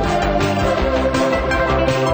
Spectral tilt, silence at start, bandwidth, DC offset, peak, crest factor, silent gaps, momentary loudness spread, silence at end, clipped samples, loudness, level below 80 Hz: -5.5 dB/octave; 0 s; over 20 kHz; under 0.1%; -4 dBFS; 12 dB; none; 1 LU; 0 s; under 0.1%; -17 LUFS; -26 dBFS